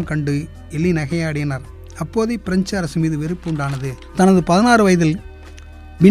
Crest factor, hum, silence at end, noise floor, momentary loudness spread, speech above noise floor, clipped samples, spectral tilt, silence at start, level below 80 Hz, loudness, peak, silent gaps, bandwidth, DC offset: 18 dB; none; 0 s; -37 dBFS; 15 LU; 19 dB; under 0.1%; -6.5 dB/octave; 0 s; -38 dBFS; -18 LUFS; 0 dBFS; none; 13.5 kHz; under 0.1%